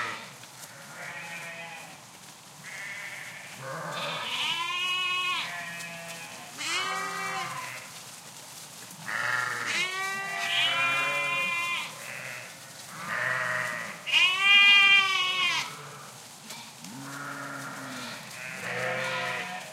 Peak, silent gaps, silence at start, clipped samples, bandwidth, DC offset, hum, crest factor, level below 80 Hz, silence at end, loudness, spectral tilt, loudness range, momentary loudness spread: -8 dBFS; none; 0 s; under 0.1%; 16 kHz; under 0.1%; none; 22 dB; -80 dBFS; 0 s; -26 LUFS; -1 dB/octave; 16 LU; 21 LU